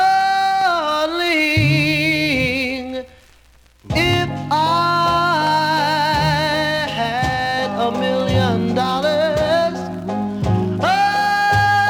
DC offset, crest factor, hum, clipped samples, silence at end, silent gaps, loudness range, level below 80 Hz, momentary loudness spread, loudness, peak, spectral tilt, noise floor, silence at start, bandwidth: under 0.1%; 14 dB; none; under 0.1%; 0 s; none; 2 LU; -40 dBFS; 6 LU; -17 LUFS; -4 dBFS; -5 dB/octave; -50 dBFS; 0 s; 20 kHz